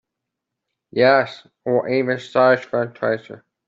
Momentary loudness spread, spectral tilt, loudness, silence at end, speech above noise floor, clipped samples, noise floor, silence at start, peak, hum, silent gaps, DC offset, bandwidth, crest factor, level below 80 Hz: 12 LU; -6.5 dB/octave; -19 LUFS; 0.3 s; 63 dB; under 0.1%; -82 dBFS; 0.95 s; -2 dBFS; none; none; under 0.1%; 7.6 kHz; 18 dB; -66 dBFS